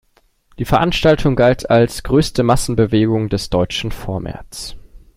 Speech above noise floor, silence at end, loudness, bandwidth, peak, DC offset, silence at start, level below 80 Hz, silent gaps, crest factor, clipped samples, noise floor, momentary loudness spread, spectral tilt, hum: 40 dB; 0.2 s; -16 LUFS; 16 kHz; 0 dBFS; under 0.1%; 0.6 s; -32 dBFS; none; 16 dB; under 0.1%; -56 dBFS; 15 LU; -6 dB/octave; none